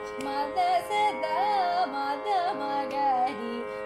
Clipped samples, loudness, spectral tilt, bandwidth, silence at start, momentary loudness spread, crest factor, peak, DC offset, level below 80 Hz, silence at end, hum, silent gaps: under 0.1%; -28 LUFS; -3.5 dB/octave; 15 kHz; 0 s; 5 LU; 12 dB; -16 dBFS; under 0.1%; -66 dBFS; 0 s; none; none